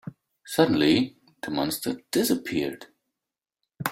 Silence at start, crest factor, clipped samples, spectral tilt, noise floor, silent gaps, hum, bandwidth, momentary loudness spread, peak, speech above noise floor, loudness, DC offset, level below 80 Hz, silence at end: 0.05 s; 22 dB; under 0.1%; -4.5 dB/octave; -88 dBFS; none; none; 16.5 kHz; 14 LU; -6 dBFS; 64 dB; -25 LUFS; under 0.1%; -62 dBFS; 0 s